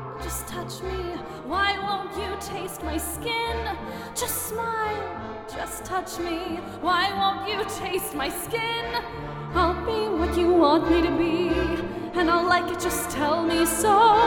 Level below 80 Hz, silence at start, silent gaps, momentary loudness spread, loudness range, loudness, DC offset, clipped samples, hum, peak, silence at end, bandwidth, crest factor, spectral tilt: -42 dBFS; 0 s; none; 12 LU; 7 LU; -25 LUFS; under 0.1%; under 0.1%; none; -6 dBFS; 0 s; 19 kHz; 18 dB; -4 dB/octave